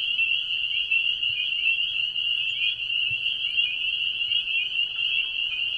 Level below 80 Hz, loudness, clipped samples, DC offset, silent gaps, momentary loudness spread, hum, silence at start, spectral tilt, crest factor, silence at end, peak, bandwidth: -62 dBFS; -23 LUFS; under 0.1%; under 0.1%; none; 2 LU; none; 0 s; 0 dB/octave; 14 dB; 0 s; -12 dBFS; 10.5 kHz